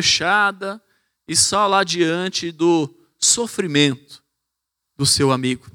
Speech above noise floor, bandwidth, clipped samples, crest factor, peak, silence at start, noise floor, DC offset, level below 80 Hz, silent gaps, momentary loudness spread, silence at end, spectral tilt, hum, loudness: 61 dB; 19 kHz; under 0.1%; 18 dB; -2 dBFS; 0 s; -80 dBFS; under 0.1%; -56 dBFS; none; 12 LU; 0.05 s; -2.5 dB/octave; none; -17 LUFS